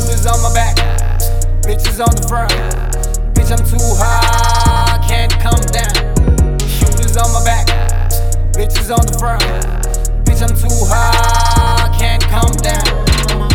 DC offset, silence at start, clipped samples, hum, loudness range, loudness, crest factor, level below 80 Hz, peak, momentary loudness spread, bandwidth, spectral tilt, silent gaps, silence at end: under 0.1%; 0 s; under 0.1%; none; 2 LU; -14 LUFS; 10 dB; -12 dBFS; 0 dBFS; 5 LU; 17 kHz; -4 dB/octave; none; 0 s